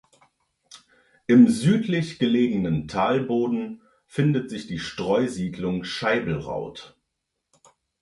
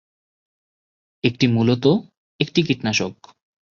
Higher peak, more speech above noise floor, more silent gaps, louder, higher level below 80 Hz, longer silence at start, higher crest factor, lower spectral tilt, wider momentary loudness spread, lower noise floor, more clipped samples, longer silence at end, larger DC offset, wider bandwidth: about the same, -4 dBFS vs -2 dBFS; second, 57 dB vs over 71 dB; second, none vs 2.17-2.39 s; second, -23 LUFS vs -20 LUFS; about the same, -54 dBFS vs -56 dBFS; second, 0.75 s vs 1.25 s; about the same, 20 dB vs 20 dB; about the same, -6.5 dB/octave vs -5.5 dB/octave; first, 15 LU vs 7 LU; second, -80 dBFS vs under -90 dBFS; neither; first, 1.15 s vs 0.65 s; neither; first, 11.5 kHz vs 7.4 kHz